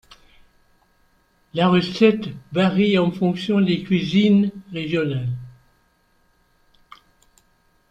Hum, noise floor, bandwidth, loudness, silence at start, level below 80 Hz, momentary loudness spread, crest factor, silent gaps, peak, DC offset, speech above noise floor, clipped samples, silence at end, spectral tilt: none; -62 dBFS; 8.4 kHz; -20 LUFS; 1.55 s; -56 dBFS; 11 LU; 20 dB; none; -2 dBFS; under 0.1%; 43 dB; under 0.1%; 2.4 s; -7.5 dB/octave